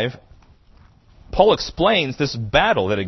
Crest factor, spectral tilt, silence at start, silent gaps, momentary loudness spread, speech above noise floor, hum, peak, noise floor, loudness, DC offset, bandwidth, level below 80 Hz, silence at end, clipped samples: 20 dB; -5 dB/octave; 0 s; none; 8 LU; 32 dB; none; 0 dBFS; -50 dBFS; -18 LUFS; under 0.1%; 6.2 kHz; -38 dBFS; 0 s; under 0.1%